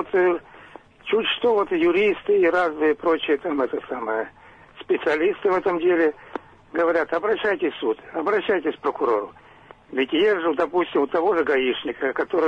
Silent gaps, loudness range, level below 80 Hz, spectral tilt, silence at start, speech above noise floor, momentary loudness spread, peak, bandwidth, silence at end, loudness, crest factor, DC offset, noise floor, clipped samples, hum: none; 3 LU; -60 dBFS; -6 dB/octave; 0 s; 27 dB; 8 LU; -10 dBFS; 7 kHz; 0 s; -22 LUFS; 12 dB; under 0.1%; -48 dBFS; under 0.1%; none